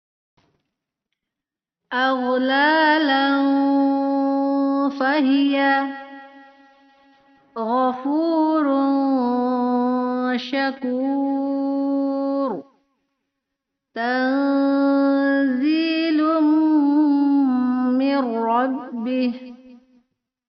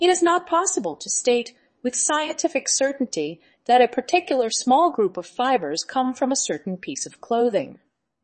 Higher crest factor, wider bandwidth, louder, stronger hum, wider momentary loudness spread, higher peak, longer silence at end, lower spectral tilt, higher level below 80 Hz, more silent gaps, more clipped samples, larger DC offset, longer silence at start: about the same, 14 dB vs 18 dB; second, 5.8 kHz vs 8.8 kHz; about the same, -20 LUFS vs -22 LUFS; neither; second, 7 LU vs 12 LU; about the same, -6 dBFS vs -4 dBFS; first, 0.7 s vs 0.5 s; about the same, -1.5 dB/octave vs -2 dB/octave; about the same, -72 dBFS vs -72 dBFS; neither; neither; neither; first, 1.9 s vs 0 s